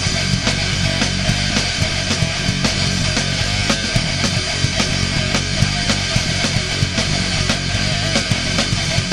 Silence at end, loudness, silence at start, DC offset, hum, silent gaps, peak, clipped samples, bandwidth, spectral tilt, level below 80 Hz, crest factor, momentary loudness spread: 0 s; -17 LUFS; 0 s; under 0.1%; none; none; -2 dBFS; under 0.1%; 14 kHz; -3.5 dB/octave; -30 dBFS; 16 dB; 1 LU